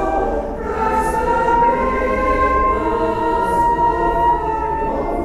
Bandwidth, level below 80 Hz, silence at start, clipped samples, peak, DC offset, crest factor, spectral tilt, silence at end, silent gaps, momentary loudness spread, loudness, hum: 13.5 kHz; -28 dBFS; 0 s; under 0.1%; -4 dBFS; under 0.1%; 12 dB; -6.5 dB/octave; 0 s; none; 5 LU; -17 LUFS; none